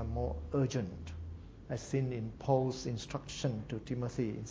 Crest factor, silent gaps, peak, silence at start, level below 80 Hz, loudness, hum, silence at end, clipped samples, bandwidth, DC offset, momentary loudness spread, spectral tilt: 20 dB; none; -16 dBFS; 0 s; -48 dBFS; -37 LUFS; none; 0 s; under 0.1%; 8 kHz; under 0.1%; 13 LU; -6.5 dB/octave